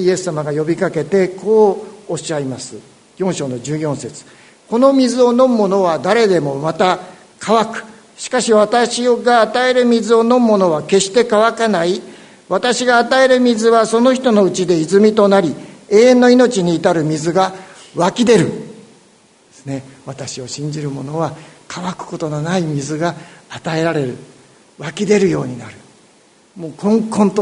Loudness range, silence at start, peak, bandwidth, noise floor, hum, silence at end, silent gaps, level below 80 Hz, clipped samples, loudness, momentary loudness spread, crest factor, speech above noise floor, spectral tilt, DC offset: 9 LU; 0 s; 0 dBFS; 11 kHz; -50 dBFS; none; 0 s; none; -58 dBFS; under 0.1%; -14 LUFS; 16 LU; 14 dB; 36 dB; -5 dB/octave; under 0.1%